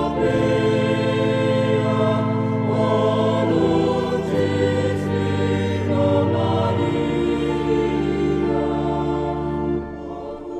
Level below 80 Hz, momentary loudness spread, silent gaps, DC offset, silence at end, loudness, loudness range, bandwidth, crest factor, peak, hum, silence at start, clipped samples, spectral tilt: -40 dBFS; 5 LU; none; under 0.1%; 0 s; -20 LUFS; 2 LU; 9.8 kHz; 14 dB; -6 dBFS; none; 0 s; under 0.1%; -7.5 dB/octave